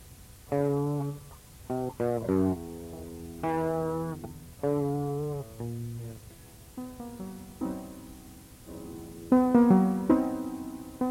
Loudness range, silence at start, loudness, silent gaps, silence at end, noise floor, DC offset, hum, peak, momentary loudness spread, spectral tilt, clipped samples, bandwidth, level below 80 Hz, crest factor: 13 LU; 0 s; -29 LUFS; none; 0 s; -50 dBFS; under 0.1%; none; -10 dBFS; 22 LU; -8 dB/octave; under 0.1%; 16.5 kHz; -54 dBFS; 20 dB